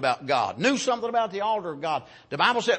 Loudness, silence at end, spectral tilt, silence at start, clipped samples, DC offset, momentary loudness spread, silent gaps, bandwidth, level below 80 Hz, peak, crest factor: -25 LUFS; 0 s; -3.5 dB/octave; 0 s; under 0.1%; under 0.1%; 7 LU; none; 8.8 kHz; -70 dBFS; -6 dBFS; 20 dB